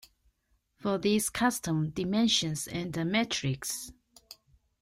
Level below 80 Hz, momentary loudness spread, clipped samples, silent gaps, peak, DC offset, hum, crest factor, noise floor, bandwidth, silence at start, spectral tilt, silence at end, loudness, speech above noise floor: -60 dBFS; 9 LU; under 0.1%; none; -12 dBFS; under 0.1%; none; 20 dB; -74 dBFS; 16 kHz; 0.8 s; -4 dB/octave; 0.5 s; -30 LUFS; 44 dB